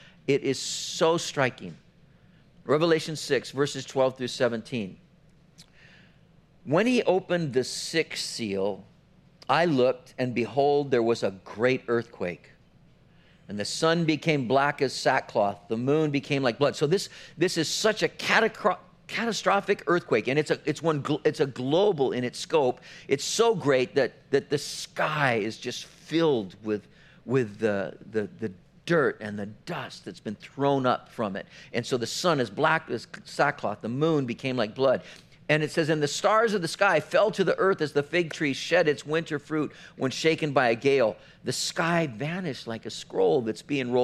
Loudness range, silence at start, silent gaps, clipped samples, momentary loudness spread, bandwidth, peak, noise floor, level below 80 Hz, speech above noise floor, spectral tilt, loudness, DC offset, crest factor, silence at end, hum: 4 LU; 0.3 s; none; under 0.1%; 12 LU; 14.5 kHz; -6 dBFS; -58 dBFS; -66 dBFS; 32 dB; -4.5 dB/octave; -26 LUFS; under 0.1%; 22 dB; 0 s; none